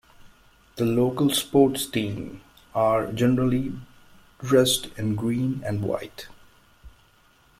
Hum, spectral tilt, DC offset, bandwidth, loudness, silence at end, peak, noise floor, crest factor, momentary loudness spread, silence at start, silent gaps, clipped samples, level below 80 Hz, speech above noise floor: none; -5 dB/octave; under 0.1%; 16 kHz; -24 LUFS; 0.7 s; -6 dBFS; -59 dBFS; 20 dB; 19 LU; 0.2 s; none; under 0.1%; -52 dBFS; 35 dB